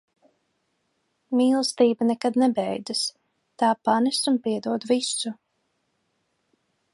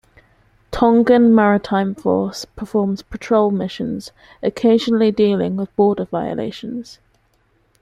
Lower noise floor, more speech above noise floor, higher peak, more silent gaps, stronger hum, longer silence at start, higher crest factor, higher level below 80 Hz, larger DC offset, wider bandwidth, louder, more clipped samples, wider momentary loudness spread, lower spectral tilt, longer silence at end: first, -74 dBFS vs -60 dBFS; first, 51 dB vs 44 dB; second, -6 dBFS vs -2 dBFS; neither; neither; first, 1.3 s vs 0.7 s; about the same, 18 dB vs 16 dB; second, -78 dBFS vs -46 dBFS; neither; about the same, 11.5 kHz vs 11.5 kHz; second, -23 LUFS vs -17 LUFS; neither; second, 7 LU vs 16 LU; second, -3.5 dB/octave vs -7 dB/octave; first, 1.6 s vs 0.9 s